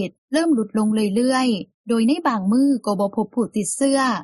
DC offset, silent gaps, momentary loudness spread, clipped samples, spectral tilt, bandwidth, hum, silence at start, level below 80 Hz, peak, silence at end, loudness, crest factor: under 0.1%; 0.18-0.28 s, 1.74-1.84 s; 5 LU; under 0.1%; -5 dB/octave; 12 kHz; none; 0 s; -66 dBFS; -8 dBFS; 0 s; -20 LUFS; 12 dB